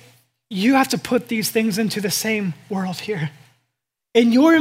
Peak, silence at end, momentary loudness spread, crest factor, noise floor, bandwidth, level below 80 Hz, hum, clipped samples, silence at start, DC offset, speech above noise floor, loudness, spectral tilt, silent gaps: -2 dBFS; 0 s; 11 LU; 18 dB; -78 dBFS; 16 kHz; -66 dBFS; none; under 0.1%; 0.5 s; under 0.1%; 60 dB; -20 LUFS; -4.5 dB/octave; none